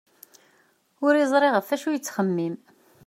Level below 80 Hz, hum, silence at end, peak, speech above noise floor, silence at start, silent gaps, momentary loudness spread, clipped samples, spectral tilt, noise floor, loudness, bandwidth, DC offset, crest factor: -82 dBFS; none; 0.5 s; -6 dBFS; 41 dB; 1 s; none; 10 LU; under 0.1%; -5 dB/octave; -63 dBFS; -23 LUFS; 16 kHz; under 0.1%; 18 dB